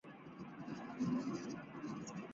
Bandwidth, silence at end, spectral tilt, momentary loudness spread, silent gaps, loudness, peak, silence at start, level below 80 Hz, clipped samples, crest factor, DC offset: 7.8 kHz; 0 s; -6.5 dB/octave; 13 LU; none; -45 LUFS; -28 dBFS; 0.05 s; -76 dBFS; under 0.1%; 16 dB; under 0.1%